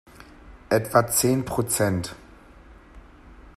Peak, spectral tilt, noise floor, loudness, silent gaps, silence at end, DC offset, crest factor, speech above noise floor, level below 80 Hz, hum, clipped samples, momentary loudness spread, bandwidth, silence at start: -4 dBFS; -4.5 dB/octave; -48 dBFS; -23 LUFS; none; 0.05 s; under 0.1%; 24 dB; 26 dB; -50 dBFS; none; under 0.1%; 7 LU; 15.5 kHz; 0.2 s